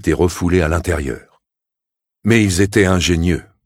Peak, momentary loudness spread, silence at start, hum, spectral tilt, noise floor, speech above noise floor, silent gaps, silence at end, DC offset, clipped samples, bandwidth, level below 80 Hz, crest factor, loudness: 0 dBFS; 9 LU; 0.05 s; none; -5.5 dB/octave; -84 dBFS; 69 dB; none; 0.25 s; under 0.1%; under 0.1%; 16 kHz; -30 dBFS; 16 dB; -16 LUFS